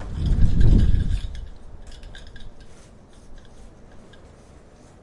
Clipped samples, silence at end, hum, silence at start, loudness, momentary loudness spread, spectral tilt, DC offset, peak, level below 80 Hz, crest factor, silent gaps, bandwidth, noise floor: under 0.1%; 1 s; none; 0 s; -22 LUFS; 26 LU; -8 dB/octave; under 0.1%; -2 dBFS; -24 dBFS; 20 dB; none; 8.8 kHz; -47 dBFS